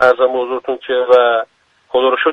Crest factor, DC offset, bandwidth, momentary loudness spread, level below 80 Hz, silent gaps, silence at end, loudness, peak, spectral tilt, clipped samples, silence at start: 14 dB; under 0.1%; 5.8 kHz; 9 LU; -60 dBFS; none; 0 s; -14 LUFS; 0 dBFS; -4.5 dB/octave; under 0.1%; 0 s